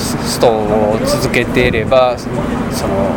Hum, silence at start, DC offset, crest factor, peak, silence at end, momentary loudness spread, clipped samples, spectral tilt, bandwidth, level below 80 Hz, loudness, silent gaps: none; 0 s; under 0.1%; 14 dB; 0 dBFS; 0 s; 6 LU; under 0.1%; -5 dB/octave; 20 kHz; -30 dBFS; -14 LUFS; none